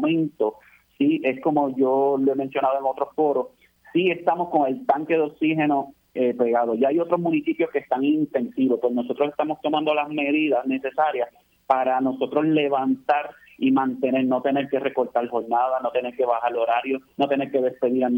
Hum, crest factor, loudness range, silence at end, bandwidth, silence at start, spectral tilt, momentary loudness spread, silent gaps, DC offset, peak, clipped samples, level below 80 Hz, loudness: none; 18 dB; 1 LU; 0 s; 16.5 kHz; 0 s; -8 dB/octave; 4 LU; none; under 0.1%; -4 dBFS; under 0.1%; -70 dBFS; -23 LUFS